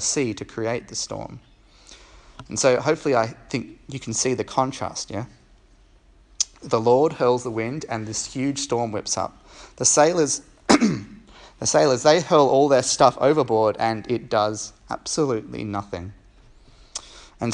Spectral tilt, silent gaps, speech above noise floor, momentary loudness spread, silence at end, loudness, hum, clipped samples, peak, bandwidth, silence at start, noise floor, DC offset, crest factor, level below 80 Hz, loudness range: -3.5 dB/octave; none; 32 dB; 15 LU; 0 s; -22 LUFS; none; under 0.1%; 0 dBFS; 11.5 kHz; 0 s; -54 dBFS; under 0.1%; 22 dB; -54 dBFS; 8 LU